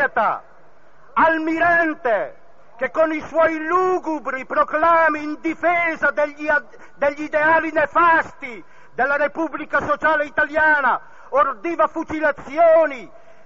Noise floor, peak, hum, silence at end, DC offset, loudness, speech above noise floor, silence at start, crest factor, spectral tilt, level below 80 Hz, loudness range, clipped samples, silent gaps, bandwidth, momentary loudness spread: -52 dBFS; -6 dBFS; none; 0.4 s; 0.9%; -19 LUFS; 33 dB; 0 s; 14 dB; -2.5 dB/octave; -56 dBFS; 1 LU; under 0.1%; none; 7.4 kHz; 10 LU